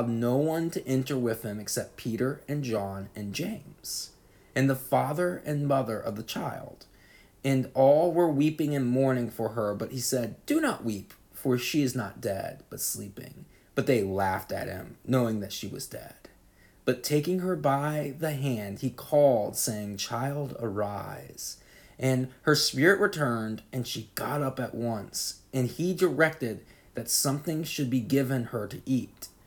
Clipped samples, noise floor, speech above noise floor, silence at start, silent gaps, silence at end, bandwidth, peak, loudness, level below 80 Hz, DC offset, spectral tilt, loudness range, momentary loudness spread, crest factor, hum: under 0.1%; -59 dBFS; 30 dB; 0 s; none; 0.2 s; 19.5 kHz; -8 dBFS; -29 LUFS; -62 dBFS; under 0.1%; -5 dB/octave; 5 LU; 13 LU; 20 dB; none